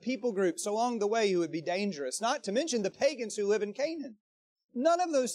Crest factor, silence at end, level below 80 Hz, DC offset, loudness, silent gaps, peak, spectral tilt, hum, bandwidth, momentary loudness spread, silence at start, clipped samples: 16 dB; 0 s; -84 dBFS; under 0.1%; -31 LUFS; 4.20-4.56 s, 4.64-4.69 s; -14 dBFS; -4 dB/octave; none; 14.5 kHz; 6 LU; 0 s; under 0.1%